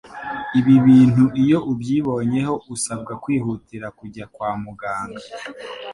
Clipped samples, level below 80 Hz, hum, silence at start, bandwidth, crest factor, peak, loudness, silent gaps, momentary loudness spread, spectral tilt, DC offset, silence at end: under 0.1%; -52 dBFS; none; 0.05 s; 11.5 kHz; 16 dB; -4 dBFS; -19 LUFS; none; 21 LU; -6.5 dB/octave; under 0.1%; 0 s